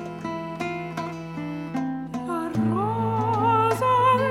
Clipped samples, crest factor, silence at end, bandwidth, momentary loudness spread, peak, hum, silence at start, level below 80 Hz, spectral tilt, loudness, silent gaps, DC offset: under 0.1%; 14 dB; 0 s; 16.5 kHz; 12 LU; -10 dBFS; none; 0 s; -58 dBFS; -7 dB/octave; -25 LUFS; none; under 0.1%